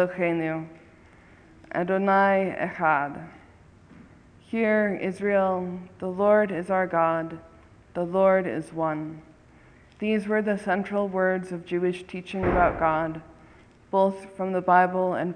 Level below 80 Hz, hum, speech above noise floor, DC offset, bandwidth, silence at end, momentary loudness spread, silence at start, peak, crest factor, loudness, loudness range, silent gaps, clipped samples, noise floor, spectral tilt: -50 dBFS; none; 29 dB; under 0.1%; 10 kHz; 0 s; 13 LU; 0 s; -6 dBFS; 20 dB; -25 LUFS; 3 LU; none; under 0.1%; -53 dBFS; -7.5 dB/octave